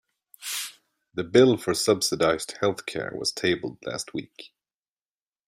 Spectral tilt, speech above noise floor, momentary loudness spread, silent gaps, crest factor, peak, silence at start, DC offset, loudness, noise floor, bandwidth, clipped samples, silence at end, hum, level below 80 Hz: -4 dB/octave; over 65 dB; 17 LU; none; 22 dB; -6 dBFS; 0.4 s; under 0.1%; -25 LUFS; under -90 dBFS; 16 kHz; under 0.1%; 1 s; none; -62 dBFS